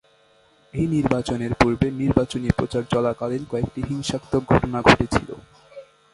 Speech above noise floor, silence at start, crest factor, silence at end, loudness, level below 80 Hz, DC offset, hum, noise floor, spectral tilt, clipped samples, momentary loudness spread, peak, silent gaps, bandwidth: 36 dB; 0.75 s; 22 dB; 0.3 s; -22 LUFS; -38 dBFS; under 0.1%; none; -57 dBFS; -6 dB/octave; under 0.1%; 10 LU; 0 dBFS; none; 11.5 kHz